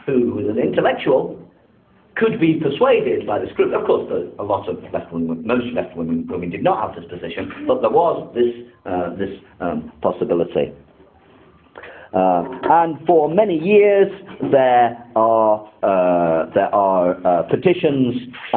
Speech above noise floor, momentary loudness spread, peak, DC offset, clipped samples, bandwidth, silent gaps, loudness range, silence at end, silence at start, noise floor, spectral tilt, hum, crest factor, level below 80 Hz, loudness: 36 dB; 12 LU; 0 dBFS; under 0.1%; under 0.1%; 4.3 kHz; none; 7 LU; 0 s; 0.05 s; -53 dBFS; -11.5 dB/octave; none; 18 dB; -52 dBFS; -18 LUFS